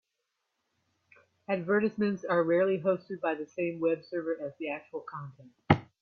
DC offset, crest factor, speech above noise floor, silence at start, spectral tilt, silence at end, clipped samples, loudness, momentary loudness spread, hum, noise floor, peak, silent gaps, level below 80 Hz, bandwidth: under 0.1%; 26 dB; 52 dB; 1.5 s; -8.5 dB/octave; 0.15 s; under 0.1%; -31 LUFS; 14 LU; none; -83 dBFS; -4 dBFS; none; -64 dBFS; 6.6 kHz